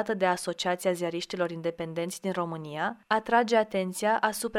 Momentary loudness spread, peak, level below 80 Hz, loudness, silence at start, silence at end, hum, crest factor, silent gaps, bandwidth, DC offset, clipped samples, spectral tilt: 8 LU; -10 dBFS; -68 dBFS; -29 LUFS; 0 s; 0 s; none; 20 dB; none; 16.5 kHz; under 0.1%; under 0.1%; -4 dB/octave